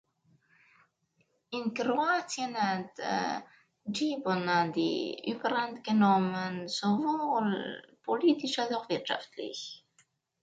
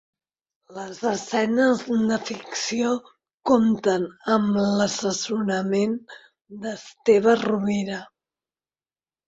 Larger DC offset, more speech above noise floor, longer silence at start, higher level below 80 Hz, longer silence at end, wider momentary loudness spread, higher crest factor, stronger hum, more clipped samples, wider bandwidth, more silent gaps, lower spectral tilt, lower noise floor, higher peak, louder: neither; second, 44 dB vs over 67 dB; first, 1.5 s vs 0.7 s; second, -78 dBFS vs -64 dBFS; second, 0.65 s vs 1.2 s; about the same, 12 LU vs 14 LU; about the same, 18 dB vs 18 dB; neither; neither; first, 9.2 kHz vs 8 kHz; second, none vs 3.34-3.38 s; about the same, -5 dB/octave vs -5 dB/octave; second, -74 dBFS vs under -90 dBFS; second, -14 dBFS vs -4 dBFS; second, -31 LUFS vs -23 LUFS